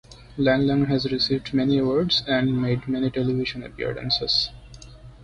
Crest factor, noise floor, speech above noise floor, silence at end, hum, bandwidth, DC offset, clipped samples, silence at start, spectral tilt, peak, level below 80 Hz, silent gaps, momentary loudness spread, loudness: 16 dB; -43 dBFS; 21 dB; 0 s; none; 9.2 kHz; under 0.1%; under 0.1%; 0.1 s; -6.5 dB/octave; -8 dBFS; -46 dBFS; none; 9 LU; -23 LUFS